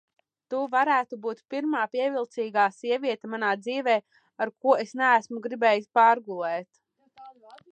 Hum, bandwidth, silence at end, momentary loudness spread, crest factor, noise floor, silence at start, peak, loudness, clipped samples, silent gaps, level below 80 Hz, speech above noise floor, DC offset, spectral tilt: none; 9 kHz; 0.4 s; 11 LU; 18 dB; -51 dBFS; 0.5 s; -8 dBFS; -26 LUFS; under 0.1%; none; -86 dBFS; 25 dB; under 0.1%; -4.5 dB/octave